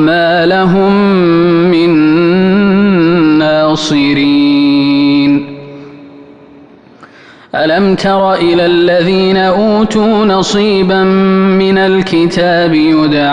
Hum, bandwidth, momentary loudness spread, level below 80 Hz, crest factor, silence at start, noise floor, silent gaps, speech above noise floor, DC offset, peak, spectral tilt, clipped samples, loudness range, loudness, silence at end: none; 9.4 kHz; 2 LU; -40 dBFS; 8 dB; 0 s; -37 dBFS; none; 29 dB; under 0.1%; 0 dBFS; -6.5 dB/octave; under 0.1%; 6 LU; -9 LUFS; 0 s